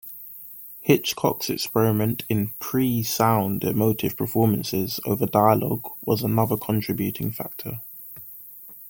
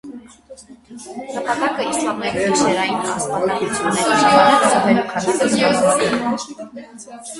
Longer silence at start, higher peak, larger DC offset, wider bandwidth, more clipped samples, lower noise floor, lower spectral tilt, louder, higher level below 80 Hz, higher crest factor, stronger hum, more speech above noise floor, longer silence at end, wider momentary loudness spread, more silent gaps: about the same, 0.05 s vs 0.05 s; about the same, -2 dBFS vs 0 dBFS; neither; first, 17 kHz vs 11.5 kHz; neither; about the same, -43 dBFS vs -42 dBFS; first, -6 dB/octave vs -3.5 dB/octave; second, -23 LUFS vs -17 LUFS; about the same, -56 dBFS vs -54 dBFS; about the same, 20 dB vs 18 dB; neither; second, 20 dB vs 24 dB; about the same, 0 s vs 0 s; second, 17 LU vs 21 LU; neither